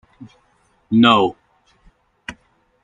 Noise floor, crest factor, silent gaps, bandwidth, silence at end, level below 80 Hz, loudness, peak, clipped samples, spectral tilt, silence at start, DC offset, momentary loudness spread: -60 dBFS; 20 dB; none; 7.6 kHz; 0.5 s; -56 dBFS; -15 LUFS; 0 dBFS; under 0.1%; -6 dB/octave; 0.2 s; under 0.1%; 23 LU